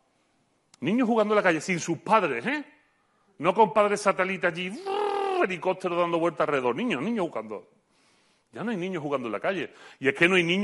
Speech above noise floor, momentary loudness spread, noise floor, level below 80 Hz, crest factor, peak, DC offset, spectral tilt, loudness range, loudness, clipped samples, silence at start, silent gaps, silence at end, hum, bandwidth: 44 dB; 11 LU; -69 dBFS; -72 dBFS; 22 dB; -6 dBFS; under 0.1%; -5 dB/octave; 5 LU; -26 LUFS; under 0.1%; 0.8 s; none; 0 s; none; 11.5 kHz